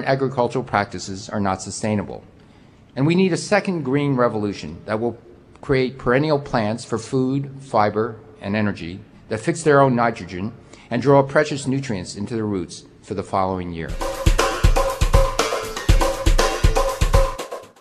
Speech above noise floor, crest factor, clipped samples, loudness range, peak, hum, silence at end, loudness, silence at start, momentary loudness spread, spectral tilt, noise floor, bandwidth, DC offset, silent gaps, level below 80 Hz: 28 dB; 18 dB; under 0.1%; 3 LU; -2 dBFS; none; 0.15 s; -21 LUFS; 0 s; 13 LU; -5.5 dB/octave; -48 dBFS; 14 kHz; under 0.1%; none; -26 dBFS